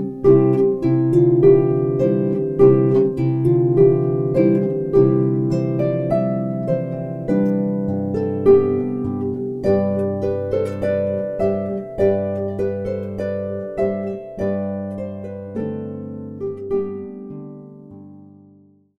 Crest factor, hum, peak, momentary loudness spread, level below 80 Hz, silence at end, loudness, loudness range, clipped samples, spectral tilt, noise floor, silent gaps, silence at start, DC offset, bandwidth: 16 dB; none; -2 dBFS; 14 LU; -48 dBFS; 0.75 s; -19 LUFS; 11 LU; under 0.1%; -11 dB/octave; -51 dBFS; none; 0 s; under 0.1%; 5.6 kHz